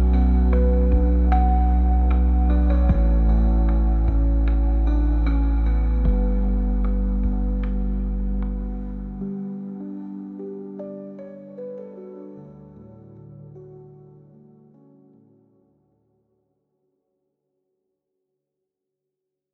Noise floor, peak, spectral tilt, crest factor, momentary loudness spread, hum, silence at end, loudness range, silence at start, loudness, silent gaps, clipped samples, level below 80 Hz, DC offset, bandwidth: -83 dBFS; -6 dBFS; -11.5 dB/octave; 14 dB; 20 LU; none; 5.7 s; 20 LU; 0 s; -22 LUFS; none; under 0.1%; -22 dBFS; under 0.1%; 4 kHz